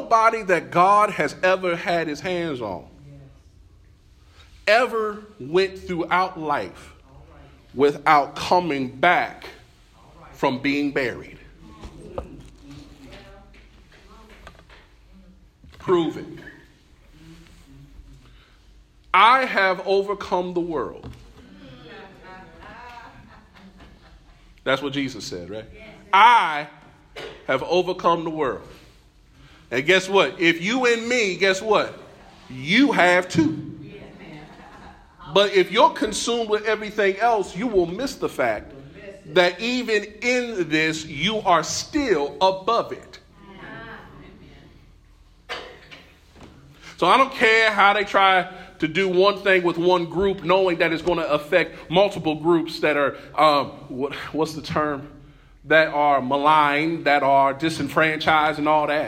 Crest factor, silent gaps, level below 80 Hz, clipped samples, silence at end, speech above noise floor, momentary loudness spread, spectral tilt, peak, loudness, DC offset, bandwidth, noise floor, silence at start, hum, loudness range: 20 dB; none; -52 dBFS; under 0.1%; 0 s; 32 dB; 21 LU; -4.5 dB/octave; -4 dBFS; -20 LUFS; under 0.1%; 15.5 kHz; -52 dBFS; 0 s; none; 11 LU